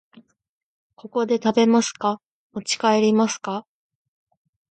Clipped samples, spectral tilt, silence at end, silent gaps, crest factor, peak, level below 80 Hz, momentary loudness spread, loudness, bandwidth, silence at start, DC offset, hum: under 0.1%; -4 dB/octave; 1.1 s; 2.26-2.50 s; 18 dB; -6 dBFS; -72 dBFS; 15 LU; -21 LUFS; 9.2 kHz; 1.05 s; under 0.1%; none